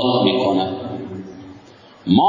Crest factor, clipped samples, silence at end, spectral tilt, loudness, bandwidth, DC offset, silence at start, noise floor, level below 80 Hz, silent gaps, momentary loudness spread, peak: 16 dB; under 0.1%; 0 s; -7.5 dB/octave; -20 LUFS; 7.4 kHz; under 0.1%; 0 s; -45 dBFS; -50 dBFS; none; 21 LU; -2 dBFS